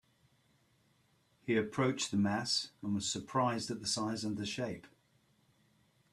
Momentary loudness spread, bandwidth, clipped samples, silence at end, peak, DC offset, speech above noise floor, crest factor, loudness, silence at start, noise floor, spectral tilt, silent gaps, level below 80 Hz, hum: 7 LU; 13 kHz; under 0.1%; 1.25 s; -18 dBFS; under 0.1%; 37 dB; 20 dB; -35 LUFS; 1.45 s; -72 dBFS; -4 dB/octave; none; -72 dBFS; none